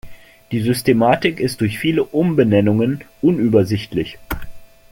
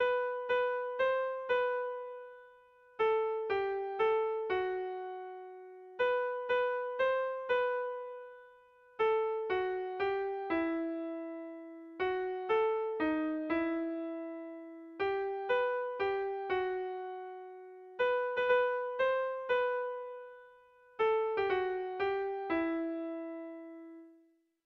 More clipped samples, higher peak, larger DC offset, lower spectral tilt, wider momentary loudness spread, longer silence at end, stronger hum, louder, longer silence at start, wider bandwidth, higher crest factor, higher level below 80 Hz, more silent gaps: neither; first, -2 dBFS vs -18 dBFS; neither; about the same, -6.5 dB/octave vs -6 dB/octave; second, 11 LU vs 17 LU; second, 0.25 s vs 0.55 s; neither; first, -17 LUFS vs -34 LUFS; about the same, 0.05 s vs 0 s; first, 17 kHz vs 6 kHz; about the same, 16 dB vs 16 dB; first, -42 dBFS vs -72 dBFS; neither